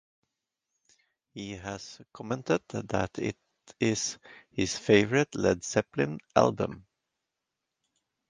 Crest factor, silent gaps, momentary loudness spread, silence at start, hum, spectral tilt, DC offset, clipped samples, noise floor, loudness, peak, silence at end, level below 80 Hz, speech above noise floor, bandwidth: 26 dB; none; 20 LU; 1.35 s; none; -4.5 dB/octave; under 0.1%; under 0.1%; -86 dBFS; -29 LUFS; -6 dBFS; 1.5 s; -58 dBFS; 57 dB; 10.5 kHz